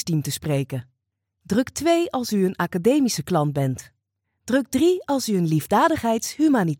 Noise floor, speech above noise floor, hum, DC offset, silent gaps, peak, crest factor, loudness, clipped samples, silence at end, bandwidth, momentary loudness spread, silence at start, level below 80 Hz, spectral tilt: -78 dBFS; 57 dB; none; under 0.1%; none; -6 dBFS; 16 dB; -22 LUFS; under 0.1%; 0.05 s; 17.5 kHz; 6 LU; 0 s; -56 dBFS; -5.5 dB/octave